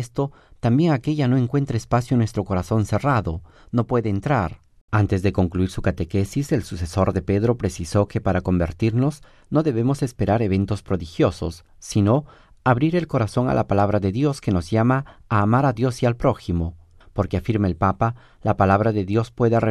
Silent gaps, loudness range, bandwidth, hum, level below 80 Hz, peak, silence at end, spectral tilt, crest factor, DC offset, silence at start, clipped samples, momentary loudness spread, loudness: 4.81-4.88 s; 2 LU; 12.5 kHz; none; -40 dBFS; -4 dBFS; 0 s; -7.5 dB/octave; 16 dB; under 0.1%; 0 s; under 0.1%; 7 LU; -22 LUFS